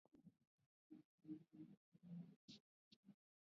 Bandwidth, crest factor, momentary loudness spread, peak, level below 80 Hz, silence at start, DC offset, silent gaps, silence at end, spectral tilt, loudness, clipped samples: 5.4 kHz; 20 dB; 9 LU; -44 dBFS; under -90 dBFS; 0.15 s; under 0.1%; 0.47-0.58 s, 0.66-0.90 s, 1.05-1.18 s, 1.77-1.92 s, 2.36-2.48 s, 2.60-3.03 s; 0.3 s; -7.5 dB/octave; -63 LUFS; under 0.1%